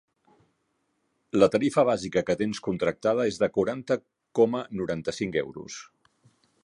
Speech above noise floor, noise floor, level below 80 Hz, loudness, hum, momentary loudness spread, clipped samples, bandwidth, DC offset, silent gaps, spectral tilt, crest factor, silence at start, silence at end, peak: 49 dB; -74 dBFS; -60 dBFS; -26 LUFS; none; 9 LU; under 0.1%; 11 kHz; under 0.1%; none; -5.5 dB/octave; 22 dB; 1.35 s; 0.8 s; -6 dBFS